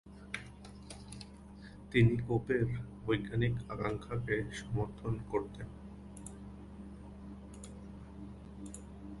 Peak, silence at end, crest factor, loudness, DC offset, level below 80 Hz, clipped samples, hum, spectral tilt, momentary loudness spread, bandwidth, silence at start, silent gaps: -14 dBFS; 0 s; 22 dB; -36 LUFS; under 0.1%; -52 dBFS; under 0.1%; none; -7 dB/octave; 18 LU; 11.5 kHz; 0.05 s; none